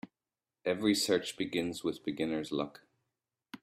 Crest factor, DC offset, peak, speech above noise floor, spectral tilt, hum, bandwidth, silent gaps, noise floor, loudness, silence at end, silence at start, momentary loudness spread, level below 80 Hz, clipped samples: 20 dB; under 0.1%; -14 dBFS; over 57 dB; -4 dB/octave; none; 15.5 kHz; none; under -90 dBFS; -34 LUFS; 0.05 s; 0.05 s; 11 LU; -72 dBFS; under 0.1%